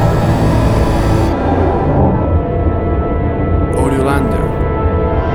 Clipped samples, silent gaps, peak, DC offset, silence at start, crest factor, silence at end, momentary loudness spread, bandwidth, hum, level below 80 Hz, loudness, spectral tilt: under 0.1%; none; 0 dBFS; under 0.1%; 0 s; 12 dB; 0 s; 3 LU; 15 kHz; none; -20 dBFS; -14 LUFS; -8 dB/octave